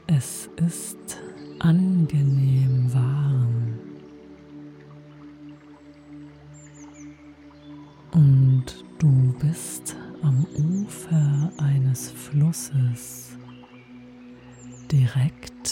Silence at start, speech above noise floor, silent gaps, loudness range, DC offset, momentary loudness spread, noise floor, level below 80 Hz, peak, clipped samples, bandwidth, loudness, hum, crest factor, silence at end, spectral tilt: 0.1 s; 26 dB; none; 9 LU; under 0.1%; 25 LU; -47 dBFS; -54 dBFS; -8 dBFS; under 0.1%; 15.5 kHz; -22 LUFS; none; 16 dB; 0 s; -7 dB/octave